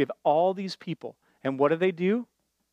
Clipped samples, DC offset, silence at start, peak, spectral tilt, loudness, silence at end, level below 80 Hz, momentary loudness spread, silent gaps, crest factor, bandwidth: under 0.1%; under 0.1%; 0 s; -10 dBFS; -7 dB/octave; -27 LUFS; 0.5 s; -78 dBFS; 14 LU; none; 16 dB; 9.8 kHz